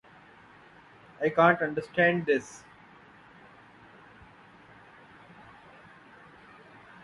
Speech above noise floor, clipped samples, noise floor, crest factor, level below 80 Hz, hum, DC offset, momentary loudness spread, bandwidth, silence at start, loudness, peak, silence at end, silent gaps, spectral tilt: 29 dB; under 0.1%; -55 dBFS; 24 dB; -70 dBFS; none; under 0.1%; 29 LU; 11.5 kHz; 1.2 s; -26 LUFS; -8 dBFS; 4.45 s; none; -6 dB/octave